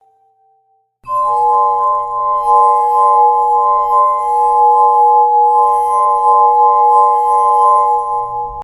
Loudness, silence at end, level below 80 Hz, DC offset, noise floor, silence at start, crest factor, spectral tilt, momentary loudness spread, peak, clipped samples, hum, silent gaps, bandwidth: -11 LUFS; 0 s; -50 dBFS; under 0.1%; -58 dBFS; 1.05 s; 12 dB; -4 dB/octave; 6 LU; 0 dBFS; under 0.1%; none; none; 11 kHz